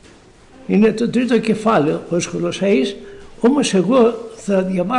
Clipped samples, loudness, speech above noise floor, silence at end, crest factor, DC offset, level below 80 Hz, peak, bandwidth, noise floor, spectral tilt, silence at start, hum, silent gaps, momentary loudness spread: under 0.1%; -17 LUFS; 29 dB; 0 s; 12 dB; under 0.1%; -50 dBFS; -6 dBFS; 11 kHz; -45 dBFS; -5.5 dB/octave; 0.7 s; none; none; 7 LU